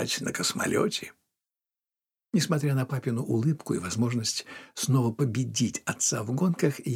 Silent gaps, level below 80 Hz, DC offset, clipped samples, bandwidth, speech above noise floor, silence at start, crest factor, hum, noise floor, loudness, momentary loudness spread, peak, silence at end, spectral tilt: none; -70 dBFS; under 0.1%; under 0.1%; 16.5 kHz; over 63 dB; 0 s; 20 dB; none; under -90 dBFS; -28 LUFS; 5 LU; -8 dBFS; 0 s; -4.5 dB/octave